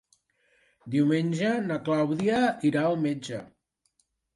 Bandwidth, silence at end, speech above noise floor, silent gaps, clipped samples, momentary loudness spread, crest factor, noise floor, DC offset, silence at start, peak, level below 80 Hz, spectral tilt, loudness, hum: 11.5 kHz; 0.9 s; 47 dB; none; under 0.1%; 8 LU; 16 dB; -73 dBFS; under 0.1%; 0.85 s; -12 dBFS; -68 dBFS; -6.5 dB/octave; -26 LUFS; none